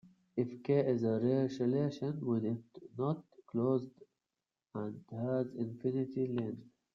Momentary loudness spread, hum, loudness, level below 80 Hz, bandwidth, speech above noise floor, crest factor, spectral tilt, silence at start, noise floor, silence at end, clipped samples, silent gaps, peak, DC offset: 11 LU; none; -36 LUFS; -78 dBFS; 7.2 kHz; over 55 dB; 16 dB; -9.5 dB/octave; 0.35 s; under -90 dBFS; 0.25 s; under 0.1%; none; -20 dBFS; under 0.1%